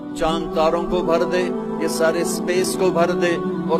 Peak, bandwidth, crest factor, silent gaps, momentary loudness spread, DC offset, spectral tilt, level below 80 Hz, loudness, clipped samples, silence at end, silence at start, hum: -4 dBFS; 15 kHz; 16 dB; none; 4 LU; under 0.1%; -5 dB/octave; -42 dBFS; -20 LUFS; under 0.1%; 0 s; 0 s; none